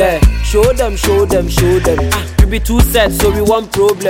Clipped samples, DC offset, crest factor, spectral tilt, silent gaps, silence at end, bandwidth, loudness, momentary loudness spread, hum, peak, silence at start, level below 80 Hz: under 0.1%; under 0.1%; 10 dB; -5 dB/octave; none; 0 s; 17 kHz; -12 LUFS; 2 LU; none; 0 dBFS; 0 s; -16 dBFS